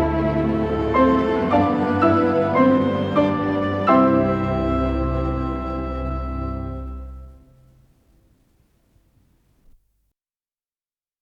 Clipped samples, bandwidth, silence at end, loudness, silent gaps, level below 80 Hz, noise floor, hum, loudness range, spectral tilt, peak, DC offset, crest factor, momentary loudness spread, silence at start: under 0.1%; 7.2 kHz; 3.9 s; -20 LUFS; none; -34 dBFS; under -90 dBFS; none; 15 LU; -9 dB/octave; -4 dBFS; under 0.1%; 18 dB; 11 LU; 0 s